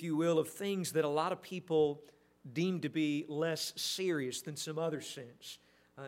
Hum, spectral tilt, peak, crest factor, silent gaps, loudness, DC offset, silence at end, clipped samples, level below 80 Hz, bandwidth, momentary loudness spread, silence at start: none; -4.5 dB/octave; -18 dBFS; 18 dB; none; -35 LUFS; under 0.1%; 0 s; under 0.1%; -80 dBFS; 16 kHz; 15 LU; 0 s